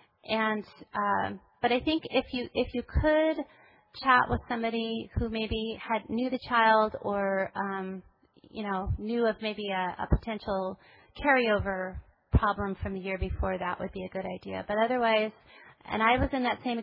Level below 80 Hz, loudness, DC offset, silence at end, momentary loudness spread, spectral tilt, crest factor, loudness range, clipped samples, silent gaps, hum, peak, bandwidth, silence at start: -42 dBFS; -29 LUFS; under 0.1%; 0 s; 12 LU; -9 dB/octave; 20 dB; 4 LU; under 0.1%; none; none; -10 dBFS; 5.6 kHz; 0.25 s